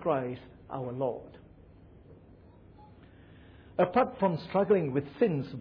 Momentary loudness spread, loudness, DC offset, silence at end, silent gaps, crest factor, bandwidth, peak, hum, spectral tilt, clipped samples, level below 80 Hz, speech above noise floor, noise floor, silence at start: 15 LU; -30 LUFS; under 0.1%; 0 s; none; 18 dB; 5.4 kHz; -14 dBFS; none; -7 dB/octave; under 0.1%; -62 dBFS; 25 dB; -55 dBFS; 0 s